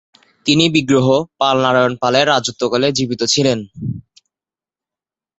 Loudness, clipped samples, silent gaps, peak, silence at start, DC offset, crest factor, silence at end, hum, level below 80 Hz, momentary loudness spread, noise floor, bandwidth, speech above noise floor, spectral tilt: -15 LUFS; under 0.1%; none; 0 dBFS; 0.45 s; under 0.1%; 16 dB; 1.4 s; none; -52 dBFS; 11 LU; under -90 dBFS; 8.2 kHz; over 75 dB; -4.5 dB/octave